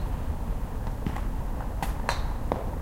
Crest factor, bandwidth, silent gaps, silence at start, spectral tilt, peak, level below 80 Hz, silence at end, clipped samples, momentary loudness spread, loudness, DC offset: 20 dB; 16.5 kHz; none; 0 s; -6 dB/octave; -8 dBFS; -30 dBFS; 0 s; under 0.1%; 4 LU; -33 LUFS; under 0.1%